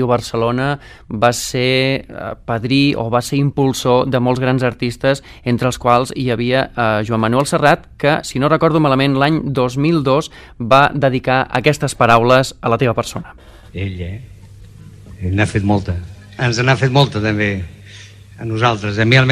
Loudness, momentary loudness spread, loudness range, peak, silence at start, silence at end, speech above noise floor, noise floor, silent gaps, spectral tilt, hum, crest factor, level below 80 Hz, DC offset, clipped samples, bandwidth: -15 LUFS; 13 LU; 5 LU; 0 dBFS; 0 s; 0 s; 23 dB; -38 dBFS; none; -5.5 dB/octave; none; 16 dB; -40 dBFS; under 0.1%; under 0.1%; 15 kHz